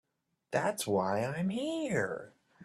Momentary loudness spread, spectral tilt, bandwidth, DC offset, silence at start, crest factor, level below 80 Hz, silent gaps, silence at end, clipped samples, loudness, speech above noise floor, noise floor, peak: 6 LU; -5 dB/octave; 14 kHz; under 0.1%; 0.5 s; 20 dB; -72 dBFS; none; 0 s; under 0.1%; -33 LUFS; 34 dB; -67 dBFS; -14 dBFS